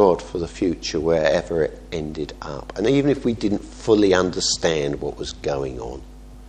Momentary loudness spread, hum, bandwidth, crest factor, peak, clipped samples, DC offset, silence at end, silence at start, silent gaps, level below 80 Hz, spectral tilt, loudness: 13 LU; none; 9.8 kHz; 20 dB; -2 dBFS; under 0.1%; under 0.1%; 0 s; 0 s; none; -40 dBFS; -4.5 dB/octave; -22 LUFS